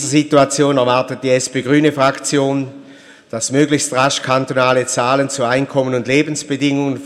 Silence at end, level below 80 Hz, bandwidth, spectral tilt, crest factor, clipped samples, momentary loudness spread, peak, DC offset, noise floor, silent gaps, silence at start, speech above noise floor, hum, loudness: 0 s; -58 dBFS; 14 kHz; -4.5 dB/octave; 16 dB; under 0.1%; 5 LU; 0 dBFS; under 0.1%; -41 dBFS; none; 0 s; 26 dB; none; -15 LUFS